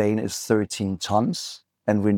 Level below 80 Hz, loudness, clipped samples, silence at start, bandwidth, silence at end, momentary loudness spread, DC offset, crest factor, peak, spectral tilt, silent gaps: -64 dBFS; -25 LUFS; under 0.1%; 0 s; 18 kHz; 0 s; 8 LU; under 0.1%; 18 dB; -6 dBFS; -5.5 dB/octave; none